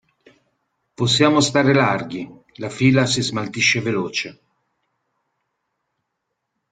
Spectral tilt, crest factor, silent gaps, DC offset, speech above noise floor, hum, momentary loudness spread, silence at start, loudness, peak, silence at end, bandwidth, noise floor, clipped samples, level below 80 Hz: -4.5 dB/octave; 20 dB; none; under 0.1%; 59 dB; none; 17 LU; 1 s; -18 LUFS; 0 dBFS; 2.4 s; 9.4 kHz; -77 dBFS; under 0.1%; -58 dBFS